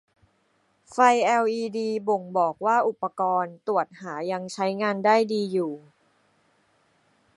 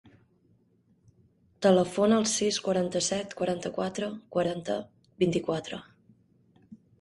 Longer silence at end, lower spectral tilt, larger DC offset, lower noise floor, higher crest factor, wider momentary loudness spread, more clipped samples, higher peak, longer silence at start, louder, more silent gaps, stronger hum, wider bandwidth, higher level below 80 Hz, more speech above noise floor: first, 1.6 s vs 0.25 s; about the same, -5 dB/octave vs -4.5 dB/octave; neither; about the same, -68 dBFS vs -66 dBFS; about the same, 22 dB vs 20 dB; about the same, 10 LU vs 11 LU; neither; first, -4 dBFS vs -10 dBFS; second, 0.9 s vs 1.6 s; first, -24 LUFS vs -28 LUFS; neither; neither; about the same, 11.5 kHz vs 11.5 kHz; second, -78 dBFS vs -66 dBFS; first, 44 dB vs 39 dB